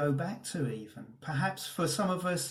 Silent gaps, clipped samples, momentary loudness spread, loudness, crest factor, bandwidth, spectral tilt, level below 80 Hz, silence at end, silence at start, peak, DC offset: none; under 0.1%; 12 LU; -33 LUFS; 16 dB; 16 kHz; -5 dB/octave; -68 dBFS; 0 s; 0 s; -18 dBFS; under 0.1%